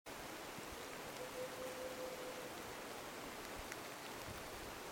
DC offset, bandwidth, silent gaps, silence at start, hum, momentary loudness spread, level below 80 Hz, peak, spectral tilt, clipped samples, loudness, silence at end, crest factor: under 0.1%; over 20 kHz; none; 0.05 s; none; 2 LU; -66 dBFS; -26 dBFS; -3 dB/octave; under 0.1%; -48 LUFS; 0 s; 22 dB